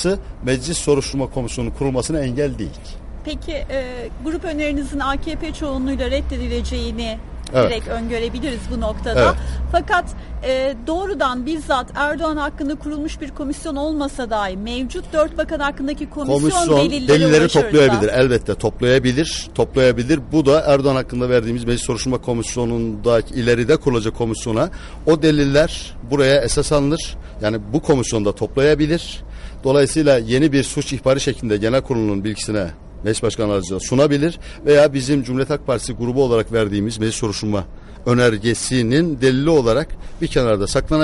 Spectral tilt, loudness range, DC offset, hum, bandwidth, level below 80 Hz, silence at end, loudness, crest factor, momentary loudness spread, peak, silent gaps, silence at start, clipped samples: -5.5 dB/octave; 7 LU; under 0.1%; none; 11.5 kHz; -32 dBFS; 0 s; -18 LUFS; 14 dB; 11 LU; -4 dBFS; none; 0 s; under 0.1%